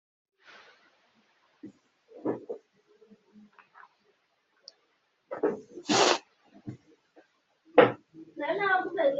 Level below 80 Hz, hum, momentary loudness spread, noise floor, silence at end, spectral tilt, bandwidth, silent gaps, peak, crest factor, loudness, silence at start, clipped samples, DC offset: -80 dBFS; none; 25 LU; -73 dBFS; 0 s; -2 dB/octave; 8 kHz; none; -4 dBFS; 28 dB; -27 LUFS; 1.65 s; under 0.1%; under 0.1%